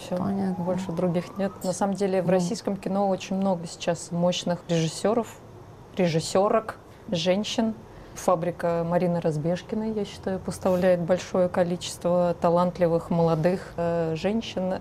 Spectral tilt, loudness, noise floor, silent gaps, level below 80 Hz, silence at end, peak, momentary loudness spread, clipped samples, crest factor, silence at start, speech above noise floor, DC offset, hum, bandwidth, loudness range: -6 dB/octave; -26 LUFS; -45 dBFS; none; -54 dBFS; 0 s; -6 dBFS; 7 LU; under 0.1%; 18 dB; 0 s; 20 dB; under 0.1%; none; 15 kHz; 3 LU